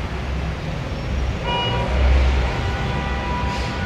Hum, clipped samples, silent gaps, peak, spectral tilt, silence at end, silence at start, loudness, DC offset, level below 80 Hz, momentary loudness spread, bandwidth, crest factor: none; under 0.1%; none; -6 dBFS; -6 dB/octave; 0 s; 0 s; -22 LUFS; under 0.1%; -22 dBFS; 8 LU; 8.4 kHz; 14 dB